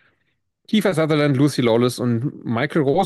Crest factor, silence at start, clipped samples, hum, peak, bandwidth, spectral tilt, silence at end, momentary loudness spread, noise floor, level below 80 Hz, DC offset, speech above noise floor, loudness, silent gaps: 12 dB; 0.7 s; under 0.1%; none; -6 dBFS; 12.5 kHz; -6.5 dB/octave; 0 s; 6 LU; -71 dBFS; -60 dBFS; under 0.1%; 53 dB; -19 LUFS; none